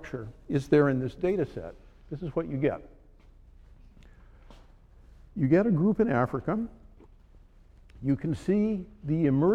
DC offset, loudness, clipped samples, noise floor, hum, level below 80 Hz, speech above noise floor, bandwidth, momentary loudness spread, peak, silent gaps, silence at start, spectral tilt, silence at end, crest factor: under 0.1%; -28 LUFS; under 0.1%; -55 dBFS; none; -52 dBFS; 28 dB; 10 kHz; 16 LU; -10 dBFS; none; 0 s; -9 dB/octave; 0 s; 18 dB